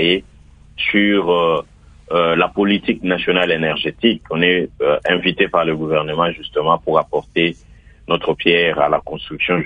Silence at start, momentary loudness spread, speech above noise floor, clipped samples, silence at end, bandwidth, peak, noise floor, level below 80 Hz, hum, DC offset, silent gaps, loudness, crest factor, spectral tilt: 0 s; 6 LU; 26 dB; under 0.1%; 0 s; 8.2 kHz; 0 dBFS; -43 dBFS; -46 dBFS; none; under 0.1%; none; -17 LUFS; 18 dB; -7 dB/octave